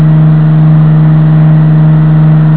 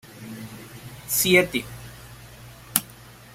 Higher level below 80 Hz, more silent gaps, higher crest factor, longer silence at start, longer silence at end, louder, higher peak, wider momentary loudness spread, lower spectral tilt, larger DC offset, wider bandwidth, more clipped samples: first, -32 dBFS vs -54 dBFS; neither; second, 4 dB vs 28 dB; second, 0 s vs 0.15 s; second, 0 s vs 0.25 s; first, -5 LUFS vs -21 LUFS; about the same, 0 dBFS vs 0 dBFS; second, 0 LU vs 26 LU; first, -13 dB/octave vs -3 dB/octave; first, 5% vs under 0.1%; second, 4 kHz vs 16 kHz; first, 8% vs under 0.1%